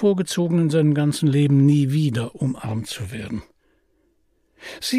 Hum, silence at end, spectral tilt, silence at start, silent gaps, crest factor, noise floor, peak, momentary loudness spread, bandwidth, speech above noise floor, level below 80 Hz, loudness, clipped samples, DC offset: none; 0 s; -6.5 dB/octave; 0 s; none; 14 dB; -64 dBFS; -8 dBFS; 15 LU; 15 kHz; 45 dB; -56 dBFS; -20 LUFS; under 0.1%; under 0.1%